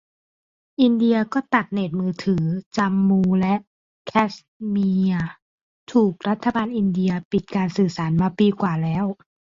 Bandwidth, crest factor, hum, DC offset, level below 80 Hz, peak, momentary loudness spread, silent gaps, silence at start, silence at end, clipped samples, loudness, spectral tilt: 7.4 kHz; 18 dB; none; under 0.1%; -54 dBFS; -4 dBFS; 7 LU; 2.66-2.71 s, 3.67-4.05 s, 4.48-4.60 s, 5.42-5.87 s, 7.25-7.31 s; 0.8 s; 0.35 s; under 0.1%; -21 LUFS; -8 dB/octave